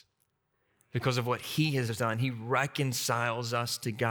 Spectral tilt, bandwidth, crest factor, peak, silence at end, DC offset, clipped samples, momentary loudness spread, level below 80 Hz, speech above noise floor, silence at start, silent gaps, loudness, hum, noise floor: -4.5 dB/octave; over 20 kHz; 20 dB; -12 dBFS; 0 s; under 0.1%; under 0.1%; 4 LU; -70 dBFS; 46 dB; 0.95 s; none; -31 LUFS; none; -77 dBFS